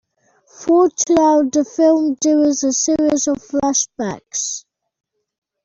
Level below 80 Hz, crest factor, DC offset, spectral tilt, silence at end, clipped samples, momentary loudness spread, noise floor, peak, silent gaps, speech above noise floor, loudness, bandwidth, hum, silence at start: -56 dBFS; 14 dB; under 0.1%; -3.5 dB/octave; 1.05 s; under 0.1%; 9 LU; -57 dBFS; -4 dBFS; none; 42 dB; -16 LUFS; 8 kHz; none; 0.6 s